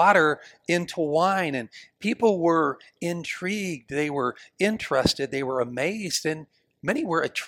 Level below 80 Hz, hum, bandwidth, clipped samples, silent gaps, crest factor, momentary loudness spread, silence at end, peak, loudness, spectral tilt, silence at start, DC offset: -58 dBFS; none; 17 kHz; under 0.1%; none; 20 dB; 9 LU; 0 s; -4 dBFS; -25 LUFS; -4.5 dB/octave; 0 s; under 0.1%